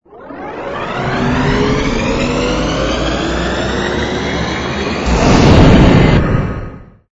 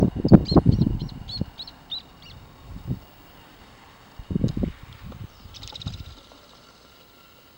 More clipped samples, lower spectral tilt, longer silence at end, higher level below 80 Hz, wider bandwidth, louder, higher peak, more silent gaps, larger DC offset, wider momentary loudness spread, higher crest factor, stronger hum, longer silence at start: first, 0.4% vs under 0.1%; second, -6 dB/octave vs -8.5 dB/octave; second, 0.3 s vs 1.45 s; first, -20 dBFS vs -38 dBFS; second, 8 kHz vs 16.5 kHz; first, -13 LUFS vs -24 LUFS; about the same, 0 dBFS vs 0 dBFS; neither; neither; second, 15 LU vs 27 LU; second, 12 dB vs 26 dB; neither; first, 0.15 s vs 0 s